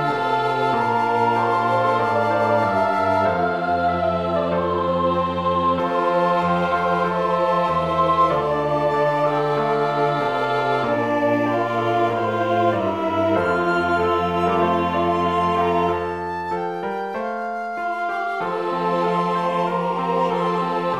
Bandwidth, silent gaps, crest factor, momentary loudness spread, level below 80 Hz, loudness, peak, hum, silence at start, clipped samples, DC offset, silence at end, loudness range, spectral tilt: 12.5 kHz; none; 14 dB; 5 LU; -52 dBFS; -20 LUFS; -6 dBFS; none; 0 s; under 0.1%; 0.2%; 0 s; 4 LU; -7 dB/octave